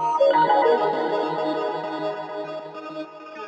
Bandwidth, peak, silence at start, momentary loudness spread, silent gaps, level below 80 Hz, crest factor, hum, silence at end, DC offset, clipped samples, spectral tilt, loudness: 8.2 kHz; -8 dBFS; 0 s; 17 LU; none; -76 dBFS; 16 dB; none; 0 s; under 0.1%; under 0.1%; -5.5 dB/octave; -22 LUFS